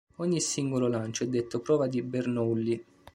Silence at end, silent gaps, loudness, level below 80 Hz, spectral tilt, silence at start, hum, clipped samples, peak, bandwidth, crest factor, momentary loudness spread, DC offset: 0.35 s; none; -29 LUFS; -66 dBFS; -5.5 dB/octave; 0.2 s; none; under 0.1%; -14 dBFS; 15 kHz; 16 dB; 4 LU; under 0.1%